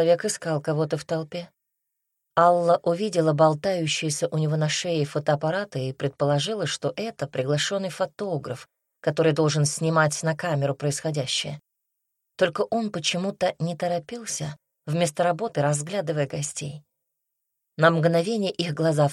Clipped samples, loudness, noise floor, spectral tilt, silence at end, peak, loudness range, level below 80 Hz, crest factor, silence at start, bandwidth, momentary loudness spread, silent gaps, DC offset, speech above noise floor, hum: under 0.1%; -25 LUFS; -80 dBFS; -5 dB/octave; 0 s; -6 dBFS; 4 LU; -68 dBFS; 20 dB; 0 s; 13 kHz; 10 LU; none; under 0.1%; 56 dB; none